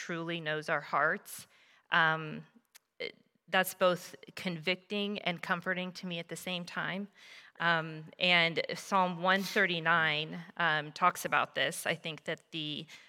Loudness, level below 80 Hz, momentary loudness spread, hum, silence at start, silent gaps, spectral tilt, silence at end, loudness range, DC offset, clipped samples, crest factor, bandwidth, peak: -32 LUFS; -84 dBFS; 14 LU; none; 0 s; none; -3.5 dB/octave; 0.05 s; 6 LU; under 0.1%; under 0.1%; 22 dB; 17 kHz; -10 dBFS